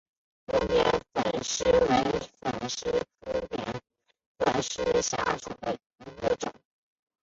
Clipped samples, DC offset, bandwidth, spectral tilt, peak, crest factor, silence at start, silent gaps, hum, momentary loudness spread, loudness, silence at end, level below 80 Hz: under 0.1%; under 0.1%; 7.8 kHz; -3.5 dB/octave; -10 dBFS; 20 dB; 0.5 s; 4.26-4.35 s, 5.86-5.90 s; none; 11 LU; -29 LUFS; 0.7 s; -50 dBFS